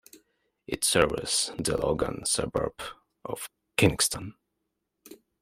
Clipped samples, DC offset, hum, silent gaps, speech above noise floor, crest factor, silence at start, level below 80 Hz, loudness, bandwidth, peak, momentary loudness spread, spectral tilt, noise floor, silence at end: under 0.1%; under 0.1%; none; none; 53 dB; 24 dB; 0.15 s; -50 dBFS; -27 LUFS; 16 kHz; -6 dBFS; 16 LU; -3 dB/octave; -81 dBFS; 0.25 s